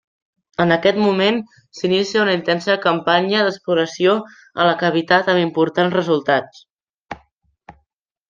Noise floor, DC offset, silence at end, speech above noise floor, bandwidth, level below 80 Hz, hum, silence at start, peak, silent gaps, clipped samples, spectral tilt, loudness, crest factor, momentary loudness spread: -71 dBFS; under 0.1%; 0.6 s; 54 dB; 7.6 kHz; -60 dBFS; none; 0.6 s; -2 dBFS; 6.70-6.76 s, 6.90-7.01 s; under 0.1%; -5.5 dB/octave; -17 LUFS; 18 dB; 12 LU